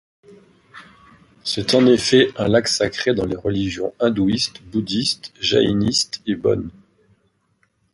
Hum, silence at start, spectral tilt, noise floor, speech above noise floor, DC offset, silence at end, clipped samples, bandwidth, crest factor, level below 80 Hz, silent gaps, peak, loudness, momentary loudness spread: none; 0.75 s; -4.5 dB/octave; -65 dBFS; 46 dB; under 0.1%; 1.25 s; under 0.1%; 11.5 kHz; 18 dB; -46 dBFS; none; -2 dBFS; -19 LUFS; 9 LU